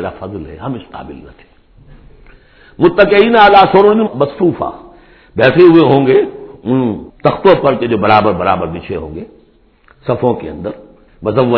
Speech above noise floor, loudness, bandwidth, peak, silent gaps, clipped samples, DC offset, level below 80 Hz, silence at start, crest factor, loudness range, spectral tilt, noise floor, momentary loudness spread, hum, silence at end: 37 dB; -11 LUFS; 5.4 kHz; 0 dBFS; none; 0.6%; under 0.1%; -42 dBFS; 0 s; 12 dB; 7 LU; -9 dB/octave; -48 dBFS; 20 LU; none; 0 s